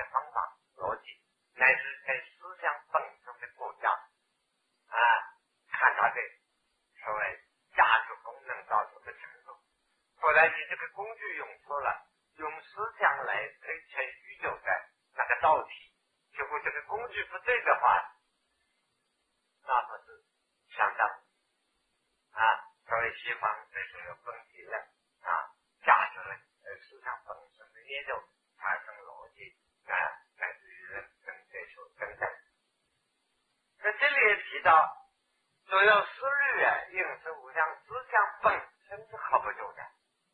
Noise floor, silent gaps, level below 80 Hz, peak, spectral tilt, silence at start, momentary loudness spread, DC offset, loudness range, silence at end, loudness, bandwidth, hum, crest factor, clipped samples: -78 dBFS; none; -72 dBFS; -8 dBFS; -4.5 dB/octave; 0 s; 22 LU; under 0.1%; 10 LU; 0.45 s; -30 LUFS; 10 kHz; none; 24 dB; under 0.1%